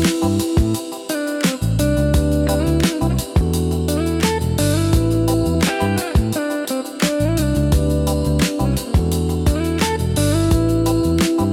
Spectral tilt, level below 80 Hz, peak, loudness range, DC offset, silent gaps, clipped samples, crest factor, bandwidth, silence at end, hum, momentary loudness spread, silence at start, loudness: -5.5 dB/octave; -26 dBFS; -4 dBFS; 1 LU; under 0.1%; none; under 0.1%; 12 dB; 17.5 kHz; 0 s; none; 4 LU; 0 s; -18 LUFS